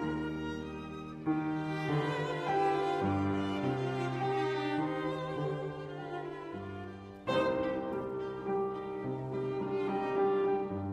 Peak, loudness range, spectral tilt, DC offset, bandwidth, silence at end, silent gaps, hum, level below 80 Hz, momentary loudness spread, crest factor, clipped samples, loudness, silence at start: -18 dBFS; 4 LU; -7.5 dB/octave; under 0.1%; 10.5 kHz; 0 s; none; none; -62 dBFS; 11 LU; 16 dB; under 0.1%; -34 LUFS; 0 s